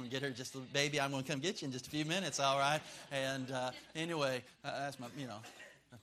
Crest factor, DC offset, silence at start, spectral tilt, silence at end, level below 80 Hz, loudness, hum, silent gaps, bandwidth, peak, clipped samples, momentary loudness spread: 24 dB; under 0.1%; 0 s; -3.5 dB/octave; 0 s; -76 dBFS; -38 LUFS; none; none; 15 kHz; -16 dBFS; under 0.1%; 13 LU